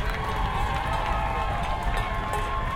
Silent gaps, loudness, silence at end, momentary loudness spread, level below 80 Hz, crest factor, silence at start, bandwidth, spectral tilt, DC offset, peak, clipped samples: none; -28 LUFS; 0 s; 1 LU; -30 dBFS; 14 dB; 0 s; 16.5 kHz; -5.5 dB/octave; under 0.1%; -12 dBFS; under 0.1%